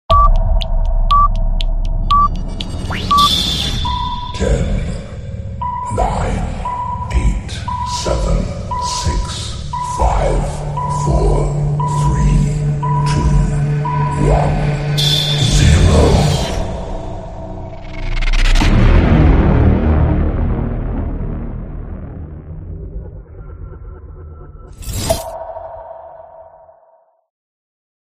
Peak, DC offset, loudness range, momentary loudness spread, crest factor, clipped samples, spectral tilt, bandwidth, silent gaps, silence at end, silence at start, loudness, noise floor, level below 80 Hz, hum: 0 dBFS; 0.1%; 13 LU; 19 LU; 16 dB; under 0.1%; -5.5 dB/octave; 15 kHz; none; 1.6 s; 0.1 s; -16 LUFS; -52 dBFS; -18 dBFS; none